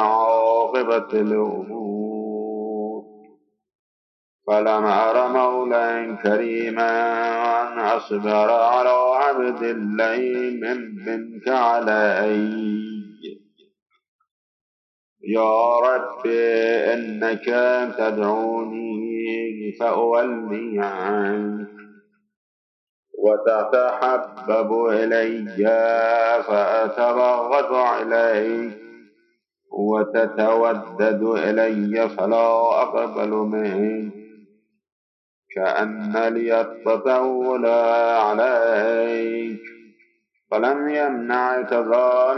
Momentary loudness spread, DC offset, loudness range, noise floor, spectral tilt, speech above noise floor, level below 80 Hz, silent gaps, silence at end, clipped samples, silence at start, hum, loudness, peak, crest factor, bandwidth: 10 LU; under 0.1%; 5 LU; -67 dBFS; -7 dB/octave; 47 dB; under -90 dBFS; 3.75-4.39 s, 13.82-13.86 s, 14.08-14.19 s, 14.31-15.16 s, 22.36-23.03 s, 34.92-35.43 s; 0 s; under 0.1%; 0 s; none; -20 LUFS; -6 dBFS; 16 dB; 6.2 kHz